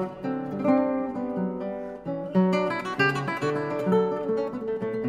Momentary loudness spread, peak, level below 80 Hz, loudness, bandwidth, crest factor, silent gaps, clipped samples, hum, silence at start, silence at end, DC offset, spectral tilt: 9 LU; -10 dBFS; -60 dBFS; -27 LUFS; 11 kHz; 16 dB; none; under 0.1%; none; 0 s; 0 s; under 0.1%; -7.5 dB/octave